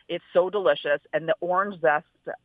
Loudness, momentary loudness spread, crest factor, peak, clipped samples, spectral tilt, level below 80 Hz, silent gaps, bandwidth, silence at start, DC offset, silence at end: -25 LUFS; 4 LU; 16 dB; -8 dBFS; under 0.1%; -7.5 dB/octave; -76 dBFS; none; 4.8 kHz; 0.1 s; under 0.1%; 0.1 s